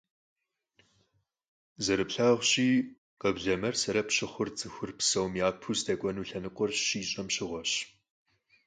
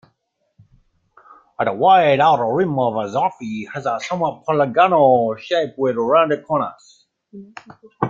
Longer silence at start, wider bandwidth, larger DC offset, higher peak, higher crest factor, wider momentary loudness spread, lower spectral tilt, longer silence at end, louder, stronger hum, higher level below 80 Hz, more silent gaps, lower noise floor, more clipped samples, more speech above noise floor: first, 1.8 s vs 1.6 s; first, 9.6 kHz vs 7.6 kHz; neither; second, -12 dBFS vs -2 dBFS; about the same, 20 dB vs 16 dB; about the same, 10 LU vs 11 LU; second, -3 dB/octave vs -6.5 dB/octave; first, 0.8 s vs 0 s; second, -30 LUFS vs -18 LUFS; neither; about the same, -62 dBFS vs -62 dBFS; first, 2.98-3.17 s vs none; first, -74 dBFS vs -70 dBFS; neither; second, 44 dB vs 52 dB